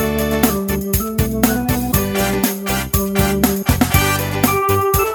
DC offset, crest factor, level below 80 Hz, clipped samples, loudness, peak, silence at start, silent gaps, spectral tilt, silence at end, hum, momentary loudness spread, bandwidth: under 0.1%; 16 dB; -28 dBFS; under 0.1%; -17 LUFS; 0 dBFS; 0 s; none; -4.5 dB/octave; 0 s; none; 4 LU; over 20 kHz